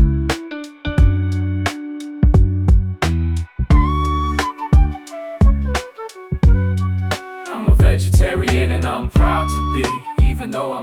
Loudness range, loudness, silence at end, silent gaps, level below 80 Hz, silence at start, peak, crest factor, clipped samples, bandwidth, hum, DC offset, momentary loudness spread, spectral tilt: 1 LU; -18 LUFS; 0 s; none; -18 dBFS; 0 s; -2 dBFS; 14 dB; under 0.1%; 14 kHz; none; under 0.1%; 10 LU; -6.5 dB/octave